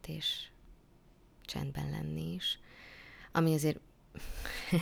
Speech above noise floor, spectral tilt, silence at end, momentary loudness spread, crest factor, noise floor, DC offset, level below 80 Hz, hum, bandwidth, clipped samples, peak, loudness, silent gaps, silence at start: 27 dB; -5 dB/octave; 0 s; 21 LU; 20 dB; -62 dBFS; under 0.1%; -52 dBFS; none; over 20 kHz; under 0.1%; -16 dBFS; -36 LUFS; none; 0.05 s